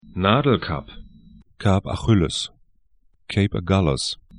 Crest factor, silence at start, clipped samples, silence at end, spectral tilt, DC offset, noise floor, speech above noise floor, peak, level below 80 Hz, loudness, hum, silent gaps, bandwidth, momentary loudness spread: 20 dB; 0.05 s; under 0.1%; 0 s; -6 dB/octave; under 0.1%; -62 dBFS; 42 dB; -2 dBFS; -40 dBFS; -21 LUFS; none; none; 10.5 kHz; 9 LU